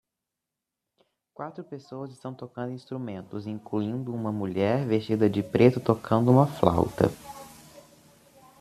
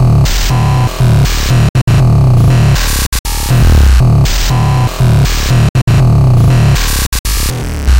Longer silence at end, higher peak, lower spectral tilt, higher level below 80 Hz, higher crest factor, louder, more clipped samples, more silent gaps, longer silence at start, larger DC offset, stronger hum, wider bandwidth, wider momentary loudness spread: first, 0.8 s vs 0 s; second, -4 dBFS vs 0 dBFS; first, -8 dB/octave vs -5.5 dB/octave; second, -58 dBFS vs -14 dBFS; first, 24 dB vs 8 dB; second, -26 LUFS vs -10 LUFS; neither; second, none vs 1.69-1.74 s, 1.82-1.87 s, 3.07-3.12 s, 3.19-3.24 s, 5.69-5.74 s, 5.82-5.87 s, 7.07-7.12 s, 7.19-7.24 s; first, 1.4 s vs 0 s; second, under 0.1% vs 1%; neither; second, 14 kHz vs 17 kHz; first, 19 LU vs 6 LU